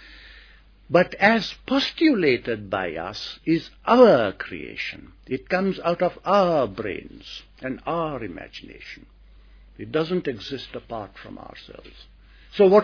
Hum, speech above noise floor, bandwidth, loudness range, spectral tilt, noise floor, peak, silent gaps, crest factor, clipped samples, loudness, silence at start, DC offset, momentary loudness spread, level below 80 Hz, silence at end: none; 28 dB; 5.4 kHz; 11 LU; -6.5 dB/octave; -51 dBFS; -2 dBFS; none; 22 dB; under 0.1%; -22 LUFS; 0.15 s; under 0.1%; 22 LU; -52 dBFS; 0 s